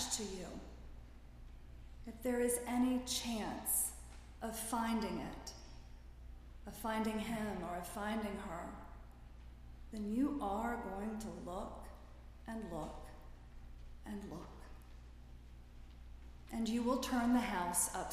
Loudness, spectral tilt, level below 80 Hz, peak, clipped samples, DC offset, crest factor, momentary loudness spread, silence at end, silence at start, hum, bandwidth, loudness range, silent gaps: -40 LUFS; -3.5 dB/octave; -54 dBFS; -20 dBFS; under 0.1%; under 0.1%; 22 dB; 23 LU; 0 s; 0 s; 60 Hz at -55 dBFS; 15.5 kHz; 12 LU; none